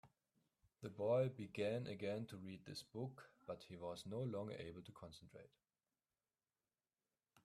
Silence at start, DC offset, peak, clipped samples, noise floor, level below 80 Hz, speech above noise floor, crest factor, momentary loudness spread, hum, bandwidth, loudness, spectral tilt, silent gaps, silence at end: 0.05 s; under 0.1%; -28 dBFS; under 0.1%; under -90 dBFS; -82 dBFS; over 43 dB; 20 dB; 19 LU; none; 14 kHz; -47 LUFS; -6.5 dB/octave; none; 2 s